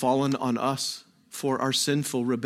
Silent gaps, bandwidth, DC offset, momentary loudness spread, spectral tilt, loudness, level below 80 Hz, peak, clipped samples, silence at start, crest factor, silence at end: none; 16 kHz; under 0.1%; 8 LU; -4 dB/octave; -26 LUFS; -72 dBFS; -12 dBFS; under 0.1%; 0 s; 16 dB; 0 s